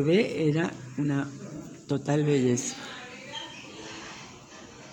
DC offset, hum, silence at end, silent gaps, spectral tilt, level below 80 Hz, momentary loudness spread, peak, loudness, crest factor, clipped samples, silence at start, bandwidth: under 0.1%; none; 0 s; none; -5.5 dB/octave; -66 dBFS; 19 LU; -12 dBFS; -28 LUFS; 18 dB; under 0.1%; 0 s; 16.5 kHz